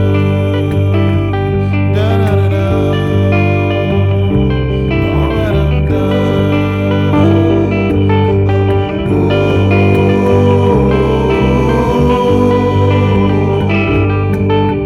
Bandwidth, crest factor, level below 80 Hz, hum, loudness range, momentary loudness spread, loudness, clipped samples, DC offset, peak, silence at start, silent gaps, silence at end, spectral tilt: 6.6 kHz; 10 dB; -24 dBFS; 50 Hz at -40 dBFS; 2 LU; 3 LU; -12 LUFS; under 0.1%; 0.3%; 0 dBFS; 0 s; none; 0 s; -8.5 dB/octave